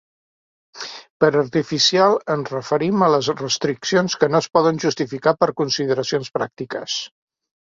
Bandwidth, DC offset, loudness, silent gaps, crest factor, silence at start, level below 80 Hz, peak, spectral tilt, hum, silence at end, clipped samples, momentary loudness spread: 7.6 kHz; under 0.1%; -19 LUFS; 1.10-1.20 s; 18 dB; 0.75 s; -62 dBFS; -2 dBFS; -4 dB/octave; none; 0.65 s; under 0.1%; 10 LU